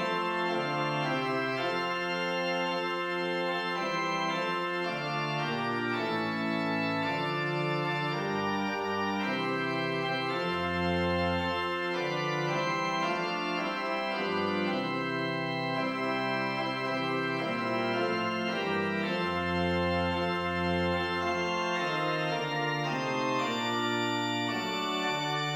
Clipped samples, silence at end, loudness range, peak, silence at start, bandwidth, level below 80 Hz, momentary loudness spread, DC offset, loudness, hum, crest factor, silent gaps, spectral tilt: under 0.1%; 0 s; 1 LU; -16 dBFS; 0 s; 16.5 kHz; -60 dBFS; 2 LU; under 0.1%; -30 LUFS; none; 14 dB; none; -5.5 dB/octave